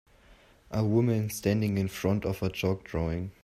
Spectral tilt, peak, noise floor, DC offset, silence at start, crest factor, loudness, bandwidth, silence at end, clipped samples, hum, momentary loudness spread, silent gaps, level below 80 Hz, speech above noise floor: -6.5 dB/octave; -12 dBFS; -58 dBFS; under 0.1%; 0.3 s; 18 dB; -29 LUFS; 15.5 kHz; 0.1 s; under 0.1%; none; 6 LU; none; -50 dBFS; 30 dB